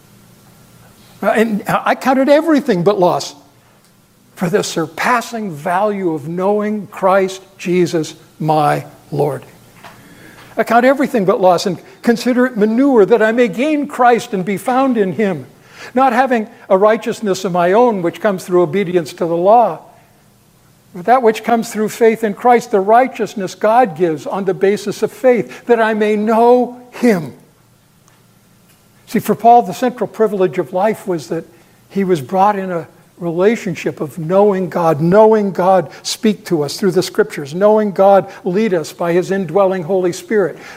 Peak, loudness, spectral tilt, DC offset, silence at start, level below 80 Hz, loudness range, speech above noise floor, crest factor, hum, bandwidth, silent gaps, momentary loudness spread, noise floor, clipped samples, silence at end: 0 dBFS; -14 LUFS; -6 dB/octave; under 0.1%; 1.2 s; -60 dBFS; 4 LU; 37 dB; 14 dB; none; 16 kHz; none; 10 LU; -50 dBFS; under 0.1%; 0 s